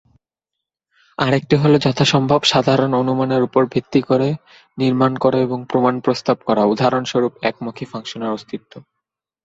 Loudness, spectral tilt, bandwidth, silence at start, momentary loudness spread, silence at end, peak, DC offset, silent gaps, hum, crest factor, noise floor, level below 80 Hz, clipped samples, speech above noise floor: -17 LUFS; -6 dB/octave; 8 kHz; 1.2 s; 14 LU; 0.65 s; 0 dBFS; under 0.1%; none; none; 18 dB; -82 dBFS; -54 dBFS; under 0.1%; 65 dB